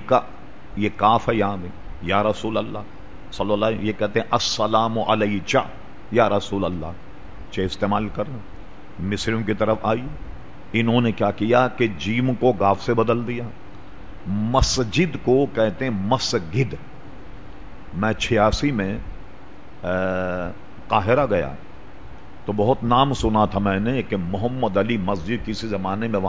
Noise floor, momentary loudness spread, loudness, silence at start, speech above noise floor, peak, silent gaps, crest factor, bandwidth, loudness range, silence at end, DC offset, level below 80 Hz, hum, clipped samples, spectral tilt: -43 dBFS; 19 LU; -22 LUFS; 0 s; 22 dB; -4 dBFS; none; 20 dB; 8 kHz; 4 LU; 0 s; 2%; -38 dBFS; none; under 0.1%; -5.5 dB/octave